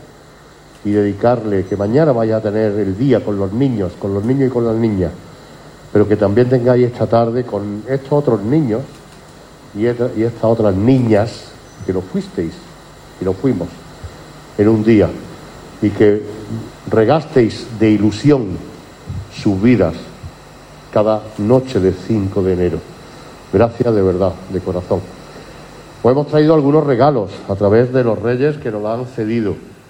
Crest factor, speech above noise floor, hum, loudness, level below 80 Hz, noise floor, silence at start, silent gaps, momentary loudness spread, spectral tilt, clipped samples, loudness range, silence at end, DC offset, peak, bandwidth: 14 dB; 27 dB; none; -15 LUFS; -46 dBFS; -41 dBFS; 0.85 s; none; 20 LU; -8.5 dB/octave; under 0.1%; 3 LU; 0.15 s; under 0.1%; -2 dBFS; 16.5 kHz